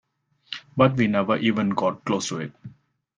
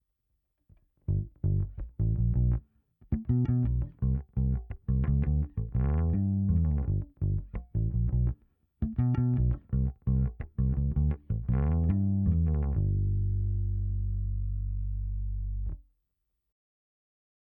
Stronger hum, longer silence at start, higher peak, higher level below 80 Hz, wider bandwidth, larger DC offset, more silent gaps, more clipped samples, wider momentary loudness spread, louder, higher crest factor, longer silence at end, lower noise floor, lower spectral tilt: neither; second, 0.5 s vs 1.1 s; first, -2 dBFS vs -16 dBFS; second, -60 dBFS vs -34 dBFS; first, 9.8 kHz vs 2.9 kHz; neither; neither; neither; first, 16 LU vs 8 LU; first, -23 LUFS vs -30 LUFS; first, 22 dB vs 14 dB; second, 0.5 s vs 1.7 s; second, -43 dBFS vs -81 dBFS; second, -5.5 dB/octave vs -13.5 dB/octave